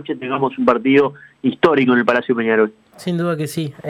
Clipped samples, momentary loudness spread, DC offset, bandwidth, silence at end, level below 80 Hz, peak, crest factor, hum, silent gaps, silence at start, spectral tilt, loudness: under 0.1%; 9 LU; under 0.1%; 15 kHz; 0 s; -60 dBFS; -2 dBFS; 16 dB; none; none; 0 s; -6.5 dB/octave; -17 LUFS